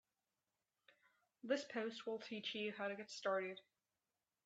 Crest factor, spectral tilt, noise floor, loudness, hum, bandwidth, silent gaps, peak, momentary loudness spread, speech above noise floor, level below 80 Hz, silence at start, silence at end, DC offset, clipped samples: 22 dB; -3.5 dB/octave; under -90 dBFS; -45 LUFS; none; 8.8 kHz; none; -26 dBFS; 7 LU; over 45 dB; under -90 dBFS; 1.45 s; 0.85 s; under 0.1%; under 0.1%